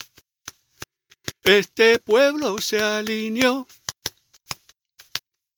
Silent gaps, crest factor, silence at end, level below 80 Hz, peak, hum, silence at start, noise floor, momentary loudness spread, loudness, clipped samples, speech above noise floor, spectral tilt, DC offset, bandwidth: none; 22 dB; 0.4 s; -60 dBFS; -2 dBFS; none; 0.45 s; -54 dBFS; 25 LU; -20 LUFS; under 0.1%; 35 dB; -3 dB/octave; under 0.1%; 19 kHz